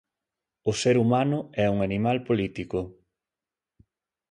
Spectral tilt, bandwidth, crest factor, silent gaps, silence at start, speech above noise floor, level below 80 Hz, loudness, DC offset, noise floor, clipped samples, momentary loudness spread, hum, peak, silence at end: -6 dB/octave; 11 kHz; 18 dB; none; 0.65 s; over 66 dB; -54 dBFS; -25 LUFS; under 0.1%; under -90 dBFS; under 0.1%; 10 LU; none; -10 dBFS; 1.4 s